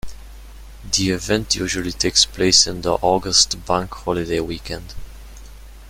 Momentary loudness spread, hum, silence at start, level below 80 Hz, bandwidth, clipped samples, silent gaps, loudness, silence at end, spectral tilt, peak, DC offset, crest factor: 15 LU; none; 0.05 s; -38 dBFS; 16.5 kHz; under 0.1%; none; -18 LUFS; 0 s; -2.5 dB/octave; 0 dBFS; under 0.1%; 20 dB